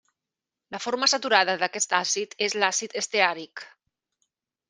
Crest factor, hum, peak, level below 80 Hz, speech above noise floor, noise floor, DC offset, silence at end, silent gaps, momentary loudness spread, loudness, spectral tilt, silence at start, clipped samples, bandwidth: 24 dB; none; -2 dBFS; -80 dBFS; 63 dB; -88 dBFS; under 0.1%; 1 s; none; 15 LU; -24 LUFS; -0.5 dB/octave; 0.7 s; under 0.1%; 10.5 kHz